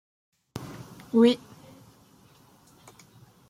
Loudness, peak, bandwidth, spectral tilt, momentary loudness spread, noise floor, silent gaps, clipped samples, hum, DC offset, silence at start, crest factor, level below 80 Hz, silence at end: -23 LUFS; -8 dBFS; 15 kHz; -6 dB/octave; 22 LU; -57 dBFS; none; under 0.1%; none; under 0.1%; 0.55 s; 22 dB; -68 dBFS; 2.15 s